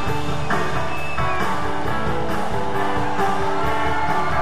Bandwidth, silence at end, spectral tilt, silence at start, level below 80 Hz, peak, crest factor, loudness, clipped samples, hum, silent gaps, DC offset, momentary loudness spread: 16 kHz; 0 s; -5.5 dB/octave; 0 s; -36 dBFS; -8 dBFS; 14 dB; -23 LUFS; under 0.1%; none; none; 9%; 3 LU